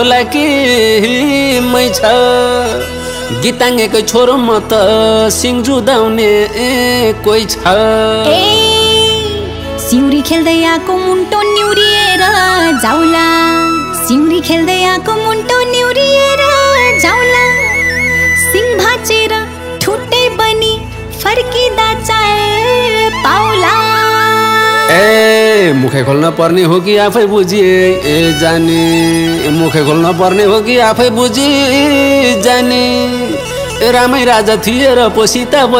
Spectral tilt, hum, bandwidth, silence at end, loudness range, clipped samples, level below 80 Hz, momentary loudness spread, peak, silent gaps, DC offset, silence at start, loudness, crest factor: -3.5 dB/octave; none; 18.5 kHz; 0 s; 2 LU; 0.8%; -34 dBFS; 5 LU; 0 dBFS; none; under 0.1%; 0 s; -9 LUFS; 10 dB